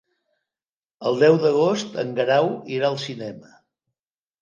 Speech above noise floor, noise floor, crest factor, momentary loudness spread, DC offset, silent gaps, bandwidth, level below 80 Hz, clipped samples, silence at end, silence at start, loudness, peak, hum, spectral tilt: over 69 dB; under -90 dBFS; 18 dB; 13 LU; under 0.1%; none; 7.4 kHz; -74 dBFS; under 0.1%; 1.05 s; 1 s; -21 LUFS; -4 dBFS; none; -5.5 dB/octave